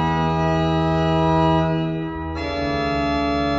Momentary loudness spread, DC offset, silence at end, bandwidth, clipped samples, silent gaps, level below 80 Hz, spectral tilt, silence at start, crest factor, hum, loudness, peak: 8 LU; under 0.1%; 0 s; 7.6 kHz; under 0.1%; none; -34 dBFS; -7.5 dB/octave; 0 s; 14 dB; none; -20 LUFS; -6 dBFS